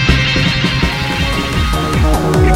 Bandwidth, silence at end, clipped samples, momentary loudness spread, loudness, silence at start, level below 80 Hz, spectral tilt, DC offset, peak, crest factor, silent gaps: 16.5 kHz; 0 s; under 0.1%; 4 LU; -14 LUFS; 0 s; -18 dBFS; -5 dB/octave; under 0.1%; 0 dBFS; 12 dB; none